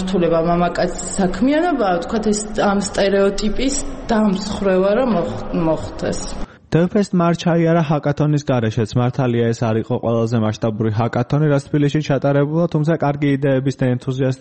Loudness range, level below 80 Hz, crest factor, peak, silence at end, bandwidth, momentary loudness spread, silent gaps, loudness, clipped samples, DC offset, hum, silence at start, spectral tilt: 1 LU; -34 dBFS; 14 dB; -2 dBFS; 0 s; 8.8 kHz; 5 LU; none; -18 LUFS; under 0.1%; under 0.1%; none; 0 s; -6.5 dB/octave